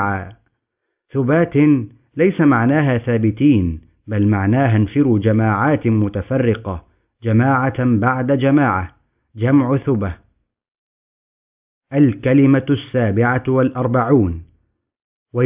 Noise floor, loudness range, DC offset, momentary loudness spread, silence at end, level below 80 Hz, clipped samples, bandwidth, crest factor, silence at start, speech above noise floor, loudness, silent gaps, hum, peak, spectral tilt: -76 dBFS; 3 LU; under 0.1%; 11 LU; 0 s; -40 dBFS; under 0.1%; 3.8 kHz; 14 dB; 0 s; 61 dB; -16 LUFS; 10.78-11.81 s, 15.04-15.26 s; none; -2 dBFS; -12.5 dB/octave